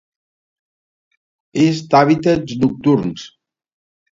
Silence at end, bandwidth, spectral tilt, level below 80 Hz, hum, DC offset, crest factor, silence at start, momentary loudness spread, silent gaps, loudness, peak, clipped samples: 0.85 s; 7.8 kHz; -7 dB/octave; -52 dBFS; none; under 0.1%; 18 dB; 1.55 s; 13 LU; none; -16 LUFS; 0 dBFS; under 0.1%